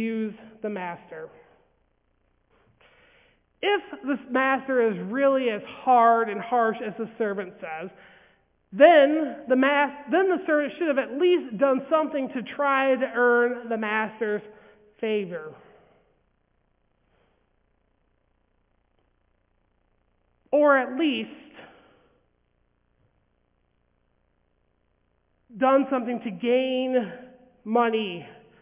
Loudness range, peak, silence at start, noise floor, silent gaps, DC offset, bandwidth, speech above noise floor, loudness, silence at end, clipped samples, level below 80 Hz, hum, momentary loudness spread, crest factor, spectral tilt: 13 LU; -4 dBFS; 0 s; -70 dBFS; none; under 0.1%; 3.8 kHz; 46 dB; -24 LUFS; 0.3 s; under 0.1%; -72 dBFS; none; 16 LU; 22 dB; -8.5 dB/octave